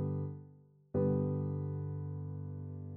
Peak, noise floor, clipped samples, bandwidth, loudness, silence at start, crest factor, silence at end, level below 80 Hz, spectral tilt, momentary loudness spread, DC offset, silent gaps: -22 dBFS; -60 dBFS; under 0.1%; 2.1 kHz; -38 LUFS; 0 s; 16 dB; 0 s; -68 dBFS; -13.5 dB/octave; 11 LU; under 0.1%; none